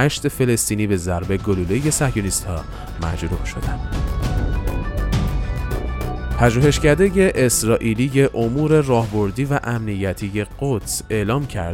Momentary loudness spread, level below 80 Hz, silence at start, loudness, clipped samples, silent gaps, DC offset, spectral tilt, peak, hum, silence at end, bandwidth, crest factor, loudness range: 10 LU; -28 dBFS; 0 s; -20 LUFS; under 0.1%; none; under 0.1%; -5.5 dB/octave; -2 dBFS; none; 0 s; 17 kHz; 18 dB; 7 LU